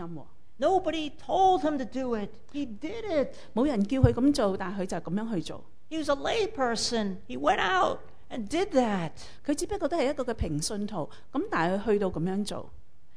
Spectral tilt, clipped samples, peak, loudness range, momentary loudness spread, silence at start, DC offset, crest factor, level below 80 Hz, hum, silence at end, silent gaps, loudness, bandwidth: -5.5 dB/octave; under 0.1%; -6 dBFS; 2 LU; 13 LU; 0 s; 1%; 22 dB; -48 dBFS; none; 0.4 s; none; -29 LUFS; 11 kHz